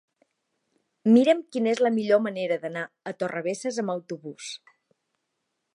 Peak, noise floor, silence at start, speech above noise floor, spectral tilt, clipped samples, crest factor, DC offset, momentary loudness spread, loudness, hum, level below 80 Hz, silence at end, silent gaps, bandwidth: -8 dBFS; -79 dBFS; 1.05 s; 55 dB; -5.5 dB/octave; under 0.1%; 20 dB; under 0.1%; 18 LU; -25 LUFS; none; -82 dBFS; 1.2 s; none; 11 kHz